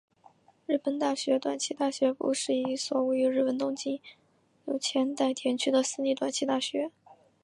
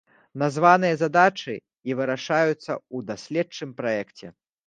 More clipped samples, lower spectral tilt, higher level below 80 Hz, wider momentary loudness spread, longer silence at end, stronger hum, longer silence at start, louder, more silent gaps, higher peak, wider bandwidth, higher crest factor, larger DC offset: neither; second, -2.5 dB/octave vs -5.5 dB/octave; second, -84 dBFS vs -72 dBFS; second, 8 LU vs 15 LU; about the same, 0.3 s vs 0.4 s; neither; first, 0.7 s vs 0.35 s; second, -29 LUFS vs -23 LUFS; neither; second, -14 dBFS vs -2 dBFS; first, 11.5 kHz vs 9.4 kHz; second, 16 dB vs 22 dB; neither